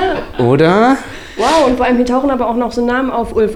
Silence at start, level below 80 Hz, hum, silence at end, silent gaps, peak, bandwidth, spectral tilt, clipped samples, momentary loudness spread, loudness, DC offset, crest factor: 0 s; -34 dBFS; none; 0 s; none; -2 dBFS; 13 kHz; -6 dB/octave; under 0.1%; 7 LU; -13 LUFS; under 0.1%; 12 dB